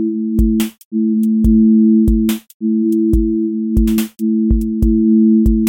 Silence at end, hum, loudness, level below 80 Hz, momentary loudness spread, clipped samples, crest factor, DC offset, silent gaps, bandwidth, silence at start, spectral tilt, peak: 0 s; none; -14 LUFS; -22 dBFS; 8 LU; under 0.1%; 10 dB; under 0.1%; 0.85-0.91 s, 2.54-2.60 s; 17 kHz; 0 s; -8 dB/octave; -2 dBFS